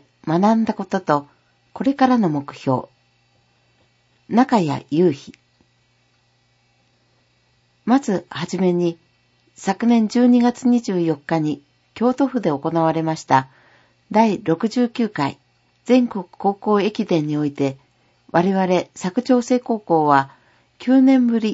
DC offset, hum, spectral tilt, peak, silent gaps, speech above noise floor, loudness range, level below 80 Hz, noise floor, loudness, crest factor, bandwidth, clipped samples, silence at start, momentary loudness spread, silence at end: under 0.1%; 60 Hz at -45 dBFS; -7 dB/octave; 0 dBFS; none; 44 dB; 5 LU; -66 dBFS; -62 dBFS; -19 LUFS; 20 dB; 8 kHz; under 0.1%; 0.25 s; 9 LU; 0 s